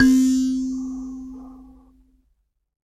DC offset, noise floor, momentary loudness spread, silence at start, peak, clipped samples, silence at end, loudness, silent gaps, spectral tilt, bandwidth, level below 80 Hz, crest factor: under 0.1%; -68 dBFS; 23 LU; 0 s; -2 dBFS; under 0.1%; 1.35 s; -22 LUFS; none; -3.5 dB/octave; 13 kHz; -48 dBFS; 20 dB